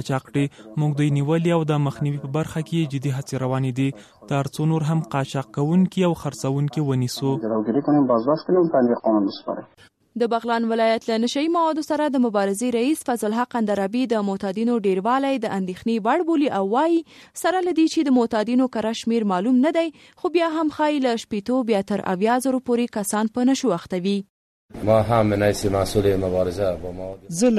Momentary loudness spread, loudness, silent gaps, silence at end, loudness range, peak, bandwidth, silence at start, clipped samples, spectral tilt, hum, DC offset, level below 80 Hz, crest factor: 7 LU; -22 LUFS; 24.30-24.68 s; 0 s; 2 LU; -6 dBFS; 13.5 kHz; 0 s; under 0.1%; -6.5 dB/octave; none; under 0.1%; -50 dBFS; 16 dB